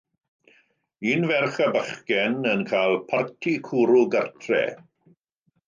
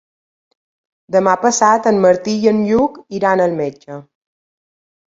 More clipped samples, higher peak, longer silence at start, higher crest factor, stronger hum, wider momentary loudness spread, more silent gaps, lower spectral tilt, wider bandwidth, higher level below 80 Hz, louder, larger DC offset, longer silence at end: neither; second, -8 dBFS vs 0 dBFS; about the same, 1 s vs 1.1 s; about the same, 16 dB vs 16 dB; neither; second, 7 LU vs 12 LU; neither; about the same, -6 dB/octave vs -5 dB/octave; about the same, 7.4 kHz vs 7.8 kHz; second, -72 dBFS vs -54 dBFS; second, -23 LUFS vs -15 LUFS; neither; second, 0.9 s vs 1.05 s